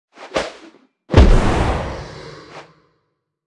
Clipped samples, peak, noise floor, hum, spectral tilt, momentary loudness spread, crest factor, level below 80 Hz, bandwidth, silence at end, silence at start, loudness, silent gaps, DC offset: under 0.1%; 0 dBFS; -71 dBFS; none; -6.5 dB/octave; 24 LU; 18 dB; -20 dBFS; 10.5 kHz; 0.85 s; 0.2 s; -18 LUFS; none; under 0.1%